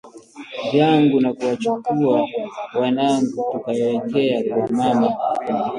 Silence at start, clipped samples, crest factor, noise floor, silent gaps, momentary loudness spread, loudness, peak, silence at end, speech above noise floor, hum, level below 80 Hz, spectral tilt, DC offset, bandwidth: 0.05 s; under 0.1%; 16 dB; -39 dBFS; none; 9 LU; -20 LUFS; -4 dBFS; 0 s; 20 dB; none; -62 dBFS; -6.5 dB/octave; under 0.1%; 11 kHz